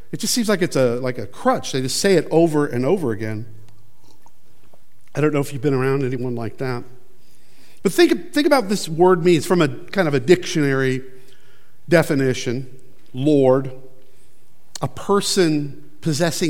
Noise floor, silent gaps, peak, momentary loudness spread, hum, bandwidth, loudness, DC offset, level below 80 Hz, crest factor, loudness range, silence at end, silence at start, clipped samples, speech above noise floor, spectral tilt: -58 dBFS; none; 0 dBFS; 12 LU; none; 17 kHz; -19 LUFS; 3%; -60 dBFS; 20 dB; 6 LU; 0 s; 0.15 s; under 0.1%; 39 dB; -5 dB/octave